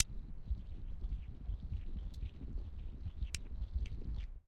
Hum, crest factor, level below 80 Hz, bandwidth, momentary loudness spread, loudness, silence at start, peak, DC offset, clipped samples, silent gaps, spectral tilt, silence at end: none; 34 dB; -42 dBFS; 9 kHz; 5 LU; -46 LUFS; 0 s; -8 dBFS; under 0.1%; under 0.1%; none; -5 dB/octave; 0.1 s